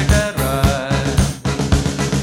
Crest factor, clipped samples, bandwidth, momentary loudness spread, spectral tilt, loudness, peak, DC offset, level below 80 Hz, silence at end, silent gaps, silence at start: 16 dB; under 0.1%; 17 kHz; 3 LU; -5 dB/octave; -18 LUFS; 0 dBFS; under 0.1%; -22 dBFS; 0 s; none; 0 s